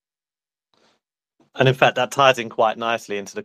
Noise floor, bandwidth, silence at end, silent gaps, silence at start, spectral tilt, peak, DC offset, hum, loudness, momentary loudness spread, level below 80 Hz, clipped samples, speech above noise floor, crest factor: under -90 dBFS; 14.5 kHz; 0 s; none; 1.55 s; -4.5 dB/octave; -2 dBFS; under 0.1%; none; -19 LUFS; 8 LU; -66 dBFS; under 0.1%; over 71 dB; 20 dB